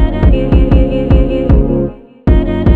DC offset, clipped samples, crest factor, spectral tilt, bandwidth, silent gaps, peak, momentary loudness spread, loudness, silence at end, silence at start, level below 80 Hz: 0.4%; under 0.1%; 10 dB; -10.5 dB/octave; 4.3 kHz; none; 0 dBFS; 6 LU; -12 LUFS; 0 s; 0 s; -12 dBFS